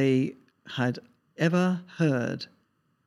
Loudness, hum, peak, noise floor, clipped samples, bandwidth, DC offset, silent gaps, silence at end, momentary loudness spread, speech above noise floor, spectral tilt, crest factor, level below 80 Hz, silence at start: -28 LUFS; none; -10 dBFS; -71 dBFS; under 0.1%; 11.5 kHz; under 0.1%; none; 0.6 s; 14 LU; 44 dB; -7 dB/octave; 18 dB; -76 dBFS; 0 s